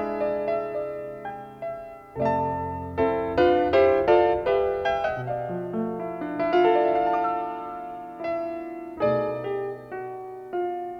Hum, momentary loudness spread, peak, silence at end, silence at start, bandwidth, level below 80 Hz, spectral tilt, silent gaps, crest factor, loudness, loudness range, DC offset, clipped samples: none; 16 LU; -8 dBFS; 0 s; 0 s; 6.4 kHz; -52 dBFS; -8 dB/octave; none; 18 dB; -25 LUFS; 7 LU; under 0.1%; under 0.1%